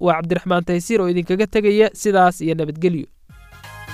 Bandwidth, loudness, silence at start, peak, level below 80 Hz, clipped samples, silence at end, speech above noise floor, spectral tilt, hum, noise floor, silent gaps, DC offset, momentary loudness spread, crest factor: 15 kHz; -18 LUFS; 0 s; -2 dBFS; -46 dBFS; under 0.1%; 0 s; 26 dB; -6 dB/octave; none; -44 dBFS; none; under 0.1%; 11 LU; 16 dB